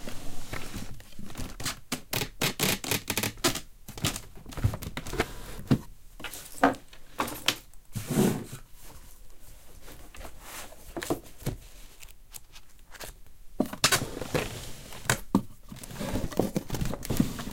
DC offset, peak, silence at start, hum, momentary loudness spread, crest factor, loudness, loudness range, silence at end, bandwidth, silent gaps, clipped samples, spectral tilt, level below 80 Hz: under 0.1%; -6 dBFS; 0 s; none; 20 LU; 26 dB; -31 LUFS; 10 LU; 0 s; 17 kHz; none; under 0.1%; -3.5 dB/octave; -44 dBFS